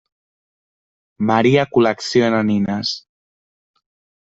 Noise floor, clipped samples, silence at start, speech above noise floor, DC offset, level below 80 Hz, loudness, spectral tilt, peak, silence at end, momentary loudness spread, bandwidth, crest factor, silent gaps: under -90 dBFS; under 0.1%; 1.2 s; over 74 dB; under 0.1%; -58 dBFS; -17 LUFS; -6 dB/octave; -2 dBFS; 1.2 s; 9 LU; 8 kHz; 18 dB; none